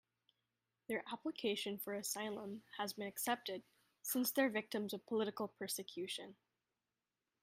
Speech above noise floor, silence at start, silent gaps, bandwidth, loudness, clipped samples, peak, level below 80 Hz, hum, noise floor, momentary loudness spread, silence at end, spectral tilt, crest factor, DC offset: over 48 dB; 0.9 s; none; 16 kHz; -42 LUFS; under 0.1%; -22 dBFS; -88 dBFS; none; under -90 dBFS; 11 LU; 1.1 s; -3 dB/octave; 22 dB; under 0.1%